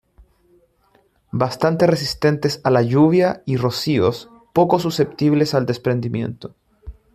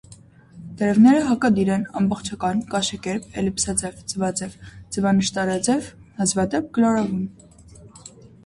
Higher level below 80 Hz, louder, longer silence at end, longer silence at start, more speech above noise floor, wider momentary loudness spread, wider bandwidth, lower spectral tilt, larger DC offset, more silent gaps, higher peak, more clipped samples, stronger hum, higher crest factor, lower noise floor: about the same, -50 dBFS vs -50 dBFS; first, -18 LUFS vs -21 LUFS; second, 0.2 s vs 0.4 s; first, 1.35 s vs 0.1 s; first, 42 dB vs 27 dB; about the same, 11 LU vs 13 LU; first, 15.5 kHz vs 11.5 kHz; first, -6.5 dB/octave vs -4.5 dB/octave; neither; neither; first, -2 dBFS vs -6 dBFS; neither; neither; about the same, 18 dB vs 16 dB; first, -59 dBFS vs -47 dBFS